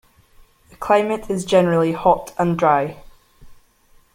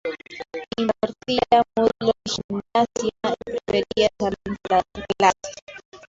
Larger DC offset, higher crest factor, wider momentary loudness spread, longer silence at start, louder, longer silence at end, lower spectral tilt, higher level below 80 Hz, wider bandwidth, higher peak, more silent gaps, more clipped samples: neither; about the same, 18 dB vs 20 dB; second, 7 LU vs 15 LU; first, 0.8 s vs 0.05 s; first, -18 LUFS vs -23 LUFS; first, 0.6 s vs 0.15 s; first, -6 dB/octave vs -4 dB/octave; about the same, -50 dBFS vs -52 dBFS; first, 16 kHz vs 8 kHz; about the same, -2 dBFS vs -2 dBFS; second, none vs 2.44-2.49 s, 5.62-5.67 s, 5.85-5.92 s; neither